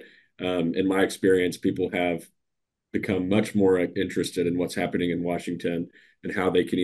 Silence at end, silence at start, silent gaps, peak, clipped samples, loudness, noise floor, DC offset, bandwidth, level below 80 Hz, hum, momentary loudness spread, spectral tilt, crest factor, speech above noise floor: 0 s; 0 s; none; -8 dBFS; under 0.1%; -26 LUFS; -82 dBFS; under 0.1%; 12.5 kHz; -60 dBFS; none; 11 LU; -6 dB/octave; 18 dB; 58 dB